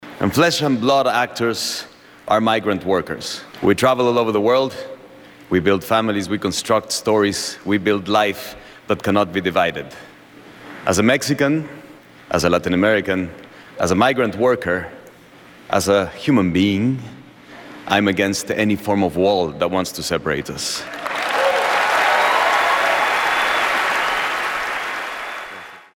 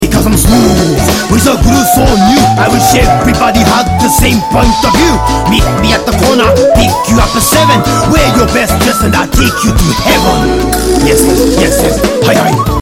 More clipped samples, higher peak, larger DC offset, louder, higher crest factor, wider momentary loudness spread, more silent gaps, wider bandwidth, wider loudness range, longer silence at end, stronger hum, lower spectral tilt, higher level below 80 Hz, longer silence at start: second, under 0.1% vs 0.2%; about the same, -2 dBFS vs 0 dBFS; neither; second, -18 LUFS vs -8 LUFS; first, 18 dB vs 8 dB; first, 12 LU vs 3 LU; neither; first, 19 kHz vs 17 kHz; first, 4 LU vs 1 LU; first, 0.15 s vs 0 s; neither; about the same, -4.5 dB/octave vs -4.5 dB/octave; second, -50 dBFS vs -16 dBFS; about the same, 0 s vs 0 s